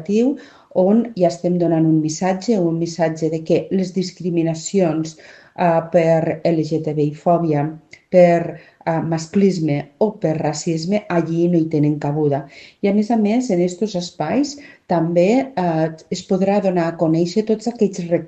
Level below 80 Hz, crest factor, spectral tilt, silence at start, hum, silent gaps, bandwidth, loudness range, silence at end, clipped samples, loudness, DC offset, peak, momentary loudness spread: -60 dBFS; 18 dB; -7 dB/octave; 0 s; none; none; 8.6 kHz; 2 LU; 0 s; under 0.1%; -18 LUFS; under 0.1%; 0 dBFS; 7 LU